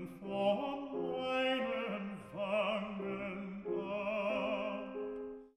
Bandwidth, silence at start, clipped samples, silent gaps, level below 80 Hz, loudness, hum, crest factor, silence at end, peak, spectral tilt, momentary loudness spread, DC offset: 12 kHz; 0 s; under 0.1%; none; -70 dBFS; -38 LUFS; none; 16 dB; 0.1 s; -22 dBFS; -6.5 dB/octave; 9 LU; under 0.1%